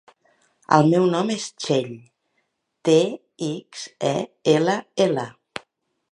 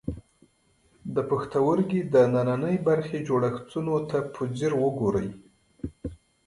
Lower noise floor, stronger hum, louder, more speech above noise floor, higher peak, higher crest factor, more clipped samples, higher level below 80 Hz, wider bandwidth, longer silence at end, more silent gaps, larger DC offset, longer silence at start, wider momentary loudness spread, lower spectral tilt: first, -73 dBFS vs -65 dBFS; neither; first, -22 LUFS vs -26 LUFS; first, 52 dB vs 40 dB; first, 0 dBFS vs -8 dBFS; about the same, 22 dB vs 18 dB; neither; second, -70 dBFS vs -52 dBFS; about the same, 11.5 kHz vs 11 kHz; first, 0.8 s vs 0.3 s; neither; neither; first, 0.7 s vs 0.05 s; about the same, 18 LU vs 17 LU; second, -5.5 dB/octave vs -8 dB/octave